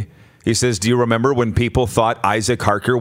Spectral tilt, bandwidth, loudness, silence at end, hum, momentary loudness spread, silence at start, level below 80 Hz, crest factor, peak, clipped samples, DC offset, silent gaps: -5 dB/octave; 16 kHz; -17 LUFS; 0 s; none; 3 LU; 0 s; -40 dBFS; 18 dB; 0 dBFS; under 0.1%; under 0.1%; none